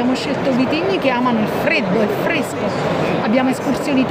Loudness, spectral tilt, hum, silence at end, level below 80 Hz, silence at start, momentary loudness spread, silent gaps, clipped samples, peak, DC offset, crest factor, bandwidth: -17 LUFS; -6 dB/octave; none; 0 s; -50 dBFS; 0 s; 3 LU; none; under 0.1%; -4 dBFS; under 0.1%; 14 dB; 16 kHz